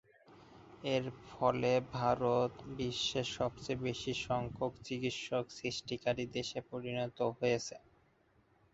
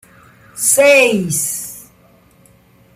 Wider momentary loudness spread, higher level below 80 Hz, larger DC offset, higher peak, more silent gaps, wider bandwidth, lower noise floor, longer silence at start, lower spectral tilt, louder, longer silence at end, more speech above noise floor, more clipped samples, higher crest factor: second, 8 LU vs 24 LU; second, -64 dBFS vs -56 dBFS; neither; second, -16 dBFS vs 0 dBFS; neither; second, 8 kHz vs 16 kHz; first, -71 dBFS vs -49 dBFS; second, 0.3 s vs 0.55 s; first, -4 dB/octave vs -2.5 dB/octave; second, -37 LUFS vs -12 LUFS; second, 0.95 s vs 1.15 s; about the same, 34 dB vs 37 dB; neither; about the same, 20 dB vs 16 dB